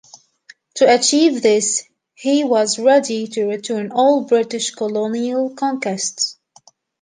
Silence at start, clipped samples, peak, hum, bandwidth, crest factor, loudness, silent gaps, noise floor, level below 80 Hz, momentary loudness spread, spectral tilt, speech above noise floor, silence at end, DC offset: 0.75 s; under 0.1%; -2 dBFS; none; 10 kHz; 16 dB; -17 LUFS; none; -52 dBFS; -70 dBFS; 9 LU; -2.5 dB/octave; 35 dB; 0.7 s; under 0.1%